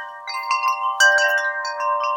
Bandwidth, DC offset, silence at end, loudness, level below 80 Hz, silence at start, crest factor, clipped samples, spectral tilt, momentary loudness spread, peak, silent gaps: 17 kHz; under 0.1%; 0 s; -18 LUFS; -86 dBFS; 0 s; 16 dB; under 0.1%; 4 dB/octave; 11 LU; -4 dBFS; none